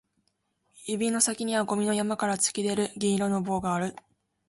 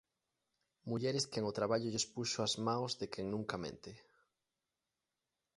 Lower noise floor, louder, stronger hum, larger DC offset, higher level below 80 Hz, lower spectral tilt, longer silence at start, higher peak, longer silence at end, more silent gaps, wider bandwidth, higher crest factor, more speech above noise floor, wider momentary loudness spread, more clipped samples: second, -75 dBFS vs under -90 dBFS; first, -27 LUFS vs -38 LUFS; neither; neither; first, -64 dBFS vs -72 dBFS; about the same, -4 dB/octave vs -4 dB/octave; about the same, 0.75 s vs 0.85 s; first, -8 dBFS vs -20 dBFS; second, 0.55 s vs 1.6 s; neither; about the same, 11.5 kHz vs 11.5 kHz; about the same, 20 dB vs 20 dB; second, 47 dB vs over 51 dB; second, 6 LU vs 11 LU; neither